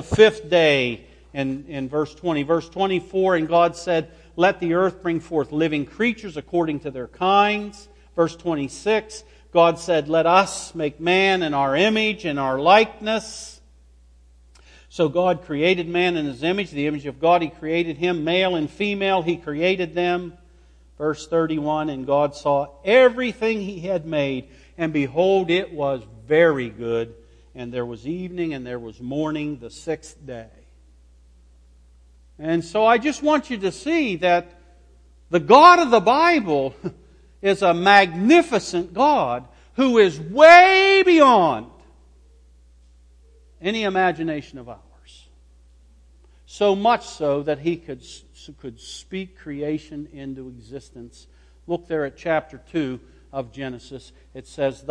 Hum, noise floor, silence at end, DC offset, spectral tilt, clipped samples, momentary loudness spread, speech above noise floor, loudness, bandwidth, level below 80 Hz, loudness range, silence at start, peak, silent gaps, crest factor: 60 Hz at -50 dBFS; -51 dBFS; 0.15 s; under 0.1%; -5 dB/octave; under 0.1%; 18 LU; 32 dB; -19 LUFS; 10.5 kHz; -52 dBFS; 14 LU; 0 s; 0 dBFS; none; 20 dB